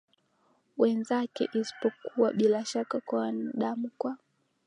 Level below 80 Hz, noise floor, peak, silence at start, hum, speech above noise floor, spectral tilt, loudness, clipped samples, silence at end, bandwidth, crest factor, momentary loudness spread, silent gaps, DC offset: -84 dBFS; -70 dBFS; -12 dBFS; 0.75 s; none; 41 dB; -5.5 dB/octave; -30 LUFS; under 0.1%; 0.5 s; 10.5 kHz; 18 dB; 9 LU; none; under 0.1%